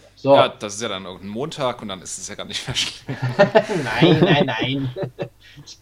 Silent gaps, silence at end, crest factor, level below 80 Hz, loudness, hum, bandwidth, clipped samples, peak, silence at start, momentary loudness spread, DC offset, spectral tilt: none; 0.1 s; 20 dB; -52 dBFS; -20 LUFS; none; 15 kHz; under 0.1%; 0 dBFS; 0.25 s; 15 LU; under 0.1%; -5 dB/octave